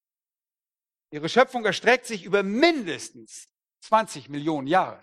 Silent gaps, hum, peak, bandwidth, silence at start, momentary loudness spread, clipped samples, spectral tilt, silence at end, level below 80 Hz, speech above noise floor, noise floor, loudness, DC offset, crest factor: none; none; -4 dBFS; 13.5 kHz; 1.1 s; 19 LU; under 0.1%; -4 dB/octave; 0.05 s; -70 dBFS; over 66 dB; under -90 dBFS; -23 LUFS; under 0.1%; 22 dB